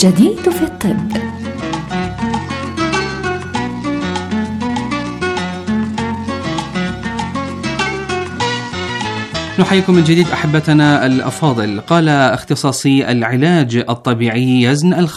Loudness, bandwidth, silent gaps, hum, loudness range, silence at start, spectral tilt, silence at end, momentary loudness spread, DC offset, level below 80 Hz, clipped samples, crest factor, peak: -15 LUFS; 15 kHz; none; none; 7 LU; 0 s; -5.5 dB/octave; 0 s; 10 LU; under 0.1%; -42 dBFS; under 0.1%; 14 dB; 0 dBFS